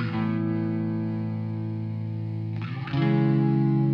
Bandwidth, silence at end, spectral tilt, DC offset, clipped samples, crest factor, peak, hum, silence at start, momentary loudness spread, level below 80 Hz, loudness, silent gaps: 5.4 kHz; 0 s; -10.5 dB/octave; under 0.1%; under 0.1%; 12 dB; -12 dBFS; none; 0 s; 9 LU; -60 dBFS; -27 LUFS; none